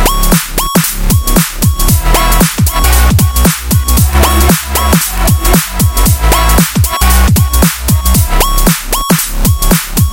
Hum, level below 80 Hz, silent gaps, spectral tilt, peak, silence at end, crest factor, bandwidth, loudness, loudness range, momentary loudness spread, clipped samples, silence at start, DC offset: none; -12 dBFS; none; -4 dB/octave; 0 dBFS; 0 s; 8 dB; 17.5 kHz; -9 LUFS; 1 LU; 3 LU; 0.4%; 0 s; under 0.1%